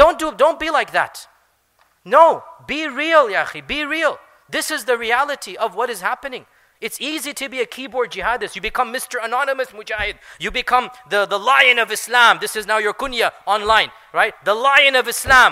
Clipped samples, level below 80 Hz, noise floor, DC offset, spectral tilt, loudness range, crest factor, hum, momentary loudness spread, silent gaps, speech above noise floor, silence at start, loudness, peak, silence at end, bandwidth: under 0.1%; -46 dBFS; -60 dBFS; under 0.1%; -1.5 dB/octave; 7 LU; 18 dB; none; 13 LU; none; 42 dB; 0 s; -17 LUFS; 0 dBFS; 0 s; 16 kHz